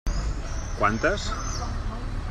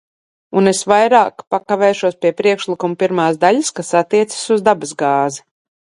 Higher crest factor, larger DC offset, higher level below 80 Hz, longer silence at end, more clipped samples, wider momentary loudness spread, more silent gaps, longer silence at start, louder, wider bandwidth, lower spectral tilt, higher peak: about the same, 18 dB vs 16 dB; neither; first, -30 dBFS vs -62 dBFS; second, 0 s vs 0.55 s; neither; first, 10 LU vs 7 LU; second, none vs 1.47-1.51 s; second, 0.05 s vs 0.5 s; second, -28 LUFS vs -15 LUFS; second, 10 kHz vs 11.5 kHz; about the same, -4.5 dB/octave vs -4.5 dB/octave; second, -8 dBFS vs 0 dBFS